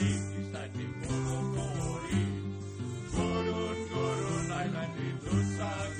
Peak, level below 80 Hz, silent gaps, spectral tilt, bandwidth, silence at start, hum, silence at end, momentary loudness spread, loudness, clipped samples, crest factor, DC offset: -18 dBFS; -50 dBFS; none; -6 dB/octave; 10 kHz; 0 s; none; 0 s; 7 LU; -34 LUFS; under 0.1%; 14 dB; under 0.1%